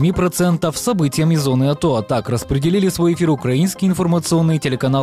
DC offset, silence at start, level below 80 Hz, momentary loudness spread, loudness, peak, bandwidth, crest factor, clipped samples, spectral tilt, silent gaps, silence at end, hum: under 0.1%; 0 s; -40 dBFS; 3 LU; -17 LUFS; -8 dBFS; 15.5 kHz; 8 dB; under 0.1%; -6 dB/octave; none; 0 s; none